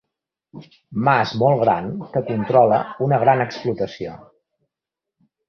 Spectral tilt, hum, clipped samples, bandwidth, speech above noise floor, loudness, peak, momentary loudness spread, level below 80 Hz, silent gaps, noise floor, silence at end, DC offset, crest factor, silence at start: -8 dB/octave; none; under 0.1%; 6.8 kHz; 67 dB; -19 LUFS; -2 dBFS; 11 LU; -56 dBFS; none; -86 dBFS; 1.3 s; under 0.1%; 18 dB; 0.55 s